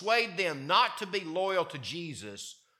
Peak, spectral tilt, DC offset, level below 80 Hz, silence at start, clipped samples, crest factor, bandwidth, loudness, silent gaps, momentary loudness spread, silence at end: -10 dBFS; -3.5 dB/octave; under 0.1%; -80 dBFS; 0 s; under 0.1%; 20 dB; 16.5 kHz; -30 LUFS; none; 15 LU; 0.25 s